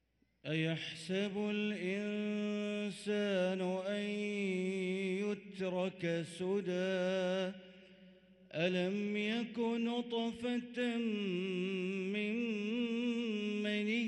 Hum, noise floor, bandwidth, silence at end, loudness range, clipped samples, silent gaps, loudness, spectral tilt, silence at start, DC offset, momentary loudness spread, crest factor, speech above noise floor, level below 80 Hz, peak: none; -61 dBFS; 11.5 kHz; 0 s; 1 LU; under 0.1%; none; -37 LUFS; -6 dB/octave; 0.45 s; under 0.1%; 4 LU; 14 dB; 25 dB; -80 dBFS; -22 dBFS